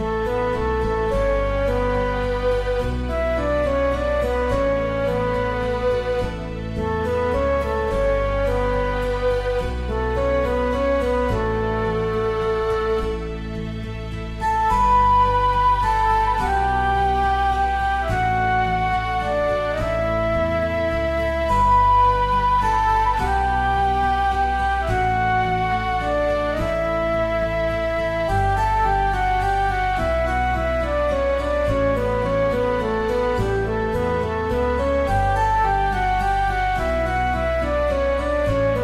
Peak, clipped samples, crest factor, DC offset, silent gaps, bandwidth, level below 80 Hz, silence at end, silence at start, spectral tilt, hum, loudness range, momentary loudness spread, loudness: -8 dBFS; under 0.1%; 12 dB; under 0.1%; none; 13 kHz; -28 dBFS; 0 s; 0 s; -6.5 dB/octave; none; 4 LU; 4 LU; -21 LUFS